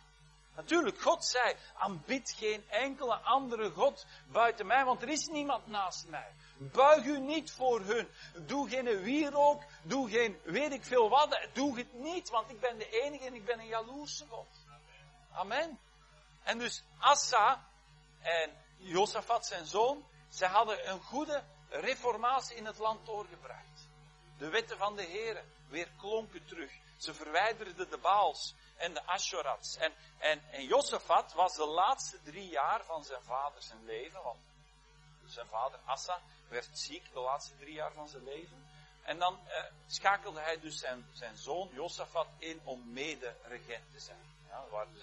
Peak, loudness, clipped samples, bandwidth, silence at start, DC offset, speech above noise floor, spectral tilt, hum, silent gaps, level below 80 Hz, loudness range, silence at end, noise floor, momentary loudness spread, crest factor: -10 dBFS; -34 LUFS; under 0.1%; 11 kHz; 0.55 s; under 0.1%; 28 dB; -2.5 dB/octave; none; none; -66 dBFS; 10 LU; 0 s; -62 dBFS; 17 LU; 26 dB